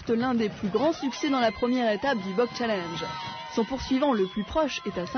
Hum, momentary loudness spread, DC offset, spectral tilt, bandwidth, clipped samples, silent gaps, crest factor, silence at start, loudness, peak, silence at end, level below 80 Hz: none; 7 LU; under 0.1%; -5 dB/octave; 6.6 kHz; under 0.1%; none; 16 dB; 0 s; -27 LUFS; -12 dBFS; 0 s; -52 dBFS